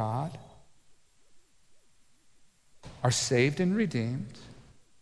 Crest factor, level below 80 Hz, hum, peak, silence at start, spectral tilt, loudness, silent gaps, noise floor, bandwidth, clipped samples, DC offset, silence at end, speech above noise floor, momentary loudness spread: 20 dB; -62 dBFS; none; -12 dBFS; 0 s; -5 dB/octave; -29 LUFS; none; -60 dBFS; 11 kHz; under 0.1%; under 0.1%; 0.4 s; 31 dB; 25 LU